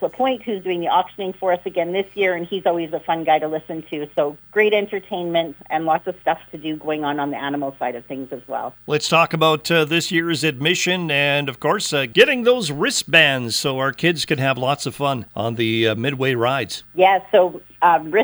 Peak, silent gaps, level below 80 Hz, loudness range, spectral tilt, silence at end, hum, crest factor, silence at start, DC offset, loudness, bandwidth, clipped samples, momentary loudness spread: 0 dBFS; none; -60 dBFS; 6 LU; -4 dB/octave; 0 s; none; 20 dB; 0 s; under 0.1%; -19 LUFS; over 20 kHz; under 0.1%; 11 LU